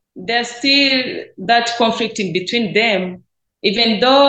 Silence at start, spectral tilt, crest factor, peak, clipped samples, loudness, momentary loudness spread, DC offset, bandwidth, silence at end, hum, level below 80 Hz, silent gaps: 0.15 s; -3.5 dB/octave; 16 dB; 0 dBFS; under 0.1%; -15 LUFS; 9 LU; under 0.1%; 9 kHz; 0 s; none; -60 dBFS; none